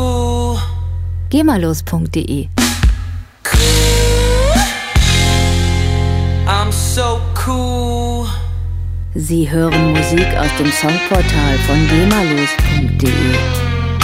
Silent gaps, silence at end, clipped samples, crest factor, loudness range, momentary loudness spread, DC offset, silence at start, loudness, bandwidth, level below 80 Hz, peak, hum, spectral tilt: none; 0 s; under 0.1%; 14 dB; 4 LU; 9 LU; under 0.1%; 0 s; -14 LUFS; 16 kHz; -20 dBFS; 0 dBFS; none; -5 dB/octave